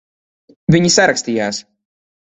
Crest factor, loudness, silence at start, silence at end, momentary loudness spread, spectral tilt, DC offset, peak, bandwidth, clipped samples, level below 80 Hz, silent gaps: 18 dB; -14 LUFS; 0.7 s; 0.75 s; 12 LU; -4 dB/octave; under 0.1%; 0 dBFS; 8.4 kHz; under 0.1%; -48 dBFS; none